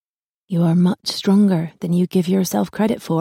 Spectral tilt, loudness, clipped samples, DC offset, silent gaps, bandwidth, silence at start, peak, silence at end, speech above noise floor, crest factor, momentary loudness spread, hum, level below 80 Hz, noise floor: -6.5 dB/octave; -18 LUFS; under 0.1%; under 0.1%; none; 16.5 kHz; 0.5 s; -6 dBFS; 0 s; 57 dB; 12 dB; 6 LU; none; -58 dBFS; -75 dBFS